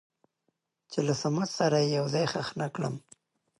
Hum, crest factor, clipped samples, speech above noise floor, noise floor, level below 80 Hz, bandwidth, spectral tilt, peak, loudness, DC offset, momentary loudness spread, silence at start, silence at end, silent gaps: none; 18 dB; under 0.1%; 51 dB; -79 dBFS; -70 dBFS; 11.5 kHz; -5.5 dB/octave; -12 dBFS; -29 LUFS; under 0.1%; 10 LU; 0.9 s; 0.6 s; none